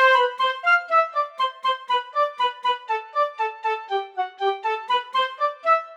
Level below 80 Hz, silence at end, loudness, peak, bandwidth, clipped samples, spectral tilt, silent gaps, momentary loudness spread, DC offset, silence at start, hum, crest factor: under -90 dBFS; 0 s; -23 LUFS; -8 dBFS; 11.5 kHz; under 0.1%; 0 dB/octave; none; 8 LU; under 0.1%; 0 s; none; 16 dB